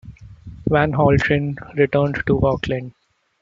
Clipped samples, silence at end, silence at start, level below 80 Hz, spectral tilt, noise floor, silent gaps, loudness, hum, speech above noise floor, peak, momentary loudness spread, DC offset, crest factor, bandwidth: under 0.1%; 0.5 s; 0.05 s; -40 dBFS; -8 dB/octave; -39 dBFS; none; -19 LUFS; none; 21 dB; -2 dBFS; 11 LU; under 0.1%; 18 dB; 7.6 kHz